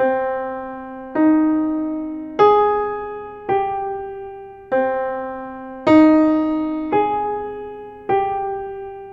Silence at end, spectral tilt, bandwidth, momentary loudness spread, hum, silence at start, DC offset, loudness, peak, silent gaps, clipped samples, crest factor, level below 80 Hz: 0 s; -7.5 dB/octave; 5.6 kHz; 18 LU; none; 0 s; under 0.1%; -19 LUFS; -2 dBFS; none; under 0.1%; 18 dB; -50 dBFS